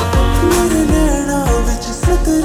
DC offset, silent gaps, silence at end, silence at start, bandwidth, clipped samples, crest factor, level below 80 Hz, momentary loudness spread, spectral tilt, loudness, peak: under 0.1%; none; 0 s; 0 s; 20 kHz; under 0.1%; 12 dB; -18 dBFS; 4 LU; -5.5 dB/octave; -15 LUFS; -2 dBFS